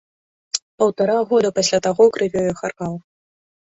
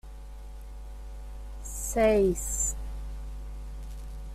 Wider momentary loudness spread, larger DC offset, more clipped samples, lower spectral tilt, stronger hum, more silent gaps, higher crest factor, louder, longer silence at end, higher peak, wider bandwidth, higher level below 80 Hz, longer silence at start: second, 11 LU vs 22 LU; neither; neither; about the same, -4 dB/octave vs -4.5 dB/octave; neither; first, 0.62-0.78 s vs none; about the same, 18 dB vs 20 dB; first, -19 LUFS vs -28 LUFS; first, 0.65 s vs 0 s; first, -2 dBFS vs -10 dBFS; second, 8 kHz vs 16 kHz; second, -58 dBFS vs -38 dBFS; first, 0.55 s vs 0.05 s